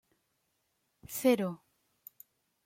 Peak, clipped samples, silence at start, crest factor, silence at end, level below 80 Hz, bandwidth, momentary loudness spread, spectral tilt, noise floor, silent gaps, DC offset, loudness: -14 dBFS; under 0.1%; 1.1 s; 22 dB; 1.1 s; -74 dBFS; 16.5 kHz; 25 LU; -5 dB/octave; -79 dBFS; none; under 0.1%; -31 LUFS